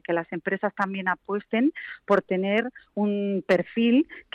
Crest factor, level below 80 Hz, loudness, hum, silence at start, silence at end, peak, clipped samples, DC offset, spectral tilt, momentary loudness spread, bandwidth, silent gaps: 14 dB; -70 dBFS; -25 LUFS; none; 0.1 s; 0.15 s; -10 dBFS; under 0.1%; under 0.1%; -7.5 dB/octave; 7 LU; 8 kHz; none